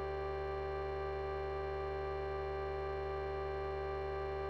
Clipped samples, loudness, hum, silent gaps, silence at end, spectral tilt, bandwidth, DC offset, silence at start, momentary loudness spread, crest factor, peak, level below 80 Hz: under 0.1%; -40 LUFS; none; none; 0 s; -8 dB/octave; 6.4 kHz; 0.1%; 0 s; 0 LU; 10 dB; -30 dBFS; -48 dBFS